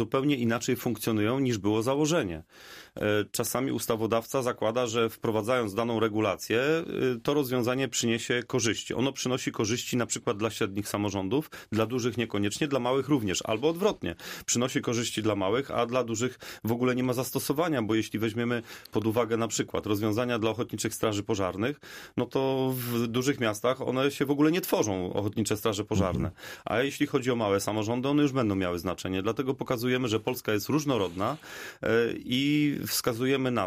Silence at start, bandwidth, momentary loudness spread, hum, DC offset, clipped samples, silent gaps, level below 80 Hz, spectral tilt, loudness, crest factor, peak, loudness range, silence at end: 0 s; 15.5 kHz; 5 LU; none; under 0.1%; under 0.1%; none; -58 dBFS; -4.5 dB/octave; -28 LUFS; 16 dB; -12 dBFS; 2 LU; 0 s